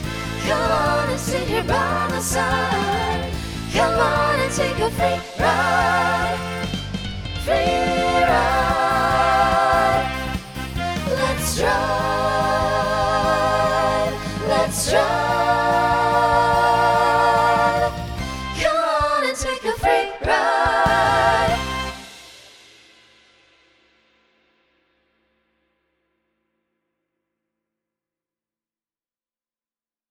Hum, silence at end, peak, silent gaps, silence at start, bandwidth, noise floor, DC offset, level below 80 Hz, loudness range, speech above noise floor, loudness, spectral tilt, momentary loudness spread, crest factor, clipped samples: none; 7.7 s; -4 dBFS; none; 0 s; 19 kHz; under -90 dBFS; under 0.1%; -36 dBFS; 3 LU; over 71 dB; -19 LUFS; -4 dB/octave; 10 LU; 16 dB; under 0.1%